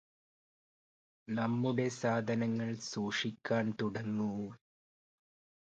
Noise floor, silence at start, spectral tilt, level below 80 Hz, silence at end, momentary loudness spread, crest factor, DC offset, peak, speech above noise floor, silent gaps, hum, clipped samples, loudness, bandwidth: under -90 dBFS; 1.3 s; -5.5 dB/octave; -74 dBFS; 1.2 s; 5 LU; 18 dB; under 0.1%; -20 dBFS; over 55 dB; none; none; under 0.1%; -35 LUFS; 8.8 kHz